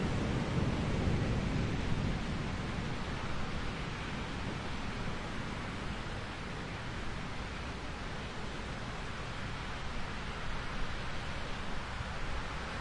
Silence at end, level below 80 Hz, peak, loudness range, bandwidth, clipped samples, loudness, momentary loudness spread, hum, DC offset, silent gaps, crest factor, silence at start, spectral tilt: 0 s; -44 dBFS; -20 dBFS; 5 LU; 11 kHz; under 0.1%; -38 LUFS; 7 LU; none; under 0.1%; none; 18 dB; 0 s; -5.5 dB/octave